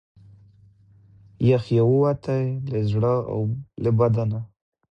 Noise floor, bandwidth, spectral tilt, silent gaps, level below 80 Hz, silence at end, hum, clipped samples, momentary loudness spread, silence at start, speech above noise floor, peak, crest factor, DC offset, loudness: -54 dBFS; 6 kHz; -10 dB/octave; none; -52 dBFS; 0.45 s; none; under 0.1%; 8 LU; 1.4 s; 33 dB; -8 dBFS; 16 dB; under 0.1%; -23 LUFS